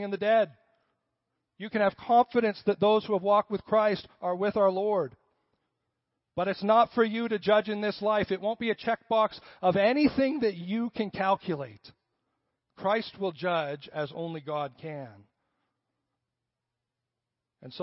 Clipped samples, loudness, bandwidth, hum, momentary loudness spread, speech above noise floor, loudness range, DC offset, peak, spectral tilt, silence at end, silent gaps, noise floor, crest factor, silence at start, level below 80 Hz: under 0.1%; -28 LUFS; 5.8 kHz; none; 12 LU; 60 dB; 9 LU; under 0.1%; -10 dBFS; -9.5 dB/octave; 0 s; none; -87 dBFS; 18 dB; 0 s; -66 dBFS